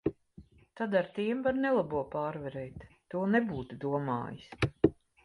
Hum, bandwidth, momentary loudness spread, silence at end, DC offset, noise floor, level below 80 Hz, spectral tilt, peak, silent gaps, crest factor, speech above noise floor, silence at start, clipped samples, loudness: none; 11.5 kHz; 11 LU; 0.3 s; under 0.1%; -57 dBFS; -56 dBFS; -8 dB/octave; -10 dBFS; none; 24 dB; 25 dB; 0.05 s; under 0.1%; -32 LUFS